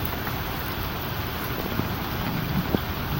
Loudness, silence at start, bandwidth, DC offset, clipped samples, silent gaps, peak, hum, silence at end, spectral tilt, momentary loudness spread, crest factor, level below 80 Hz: -28 LUFS; 0 s; 17 kHz; under 0.1%; under 0.1%; none; -6 dBFS; none; 0 s; -5.5 dB/octave; 3 LU; 20 dB; -38 dBFS